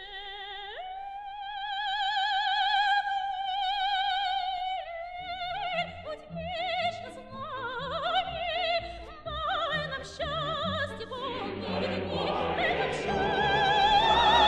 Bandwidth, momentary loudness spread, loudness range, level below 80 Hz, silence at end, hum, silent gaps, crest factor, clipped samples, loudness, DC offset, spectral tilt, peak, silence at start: 10.5 kHz; 14 LU; 5 LU; -52 dBFS; 0 s; none; none; 18 dB; under 0.1%; -29 LUFS; under 0.1%; -4 dB/octave; -12 dBFS; 0 s